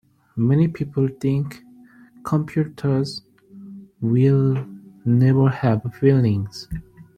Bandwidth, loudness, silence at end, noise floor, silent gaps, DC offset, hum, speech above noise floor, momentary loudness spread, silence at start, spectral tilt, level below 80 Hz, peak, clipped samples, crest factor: 9.4 kHz; -20 LUFS; 0.15 s; -48 dBFS; none; under 0.1%; none; 29 dB; 18 LU; 0.35 s; -9 dB/octave; -50 dBFS; -4 dBFS; under 0.1%; 18 dB